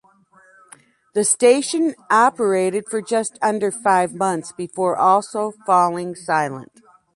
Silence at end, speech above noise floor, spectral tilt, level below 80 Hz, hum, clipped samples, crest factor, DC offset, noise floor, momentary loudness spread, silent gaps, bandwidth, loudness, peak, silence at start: 0.55 s; 34 dB; -3.5 dB/octave; -70 dBFS; none; under 0.1%; 16 dB; under 0.1%; -53 dBFS; 11 LU; none; 11.5 kHz; -19 LUFS; -2 dBFS; 1.15 s